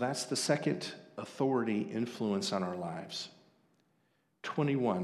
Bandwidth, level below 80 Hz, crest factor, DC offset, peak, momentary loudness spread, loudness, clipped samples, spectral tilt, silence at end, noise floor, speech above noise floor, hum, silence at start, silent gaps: 13.5 kHz; -82 dBFS; 18 dB; under 0.1%; -16 dBFS; 12 LU; -34 LUFS; under 0.1%; -5 dB/octave; 0 s; -75 dBFS; 41 dB; none; 0 s; none